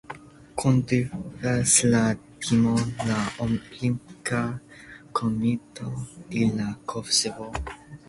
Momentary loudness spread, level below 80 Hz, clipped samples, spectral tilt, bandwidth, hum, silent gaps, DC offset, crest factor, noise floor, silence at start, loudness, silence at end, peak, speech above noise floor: 15 LU; -48 dBFS; under 0.1%; -4.5 dB/octave; 11.5 kHz; none; none; under 0.1%; 22 dB; -47 dBFS; 0.1 s; -25 LUFS; 0.1 s; -4 dBFS; 22 dB